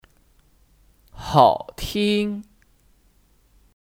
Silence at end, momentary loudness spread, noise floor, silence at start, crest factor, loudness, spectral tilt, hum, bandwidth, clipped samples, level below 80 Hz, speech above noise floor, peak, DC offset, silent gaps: 1.4 s; 16 LU; -59 dBFS; 1.15 s; 24 dB; -20 LUFS; -5.5 dB/octave; none; 17 kHz; under 0.1%; -46 dBFS; 40 dB; -2 dBFS; under 0.1%; none